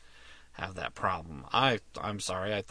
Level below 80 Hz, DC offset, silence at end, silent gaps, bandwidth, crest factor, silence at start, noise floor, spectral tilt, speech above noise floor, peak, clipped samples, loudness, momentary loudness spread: -56 dBFS; under 0.1%; 0 s; none; 11 kHz; 24 dB; 0 s; -53 dBFS; -4 dB/octave; 20 dB; -10 dBFS; under 0.1%; -32 LUFS; 13 LU